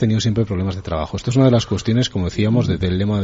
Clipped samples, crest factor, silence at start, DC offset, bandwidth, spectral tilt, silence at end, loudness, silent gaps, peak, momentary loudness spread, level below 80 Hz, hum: under 0.1%; 14 dB; 0 s; under 0.1%; 8 kHz; -6.5 dB/octave; 0 s; -19 LUFS; none; -4 dBFS; 8 LU; -40 dBFS; none